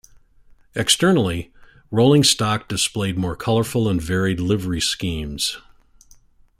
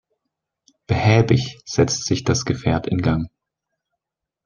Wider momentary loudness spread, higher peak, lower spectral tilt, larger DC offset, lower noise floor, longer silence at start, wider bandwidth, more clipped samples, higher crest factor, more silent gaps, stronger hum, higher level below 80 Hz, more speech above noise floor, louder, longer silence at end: about the same, 11 LU vs 9 LU; about the same, -2 dBFS vs -2 dBFS; second, -4 dB/octave vs -5.5 dB/octave; neither; second, -51 dBFS vs -85 dBFS; second, 0.75 s vs 0.9 s; first, 16 kHz vs 10 kHz; neither; about the same, 18 dB vs 20 dB; neither; neither; about the same, -44 dBFS vs -46 dBFS; second, 32 dB vs 66 dB; about the same, -19 LUFS vs -20 LUFS; second, 1 s vs 1.2 s